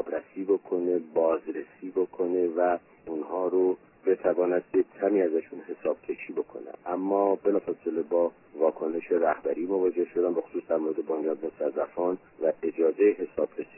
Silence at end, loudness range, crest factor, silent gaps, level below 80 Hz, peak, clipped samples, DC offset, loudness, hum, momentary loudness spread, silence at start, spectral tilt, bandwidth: 0.15 s; 2 LU; 16 dB; none; -72 dBFS; -12 dBFS; under 0.1%; under 0.1%; -28 LUFS; none; 9 LU; 0 s; -11 dB/octave; 3 kHz